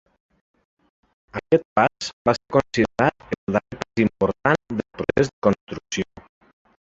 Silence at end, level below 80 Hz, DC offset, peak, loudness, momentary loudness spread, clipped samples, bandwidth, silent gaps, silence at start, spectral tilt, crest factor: 0.8 s; -50 dBFS; under 0.1%; -2 dBFS; -23 LUFS; 9 LU; under 0.1%; 8 kHz; 1.65-1.76 s, 2.13-2.25 s, 3.38-3.47 s, 5.33-5.42 s, 5.61-5.67 s; 1.35 s; -6 dB/octave; 22 dB